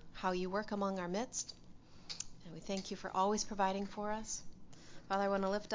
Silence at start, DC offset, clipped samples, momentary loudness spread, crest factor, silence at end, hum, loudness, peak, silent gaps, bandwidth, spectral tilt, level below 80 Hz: 0 s; under 0.1%; under 0.1%; 21 LU; 18 dB; 0 s; none; -39 LUFS; -20 dBFS; none; 7.8 kHz; -4 dB/octave; -62 dBFS